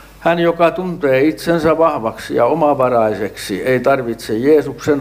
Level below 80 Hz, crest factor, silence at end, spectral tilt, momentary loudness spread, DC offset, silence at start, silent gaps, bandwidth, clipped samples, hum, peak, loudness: -46 dBFS; 14 dB; 0 s; -6 dB/octave; 7 LU; under 0.1%; 0 s; none; 16 kHz; under 0.1%; none; -2 dBFS; -15 LUFS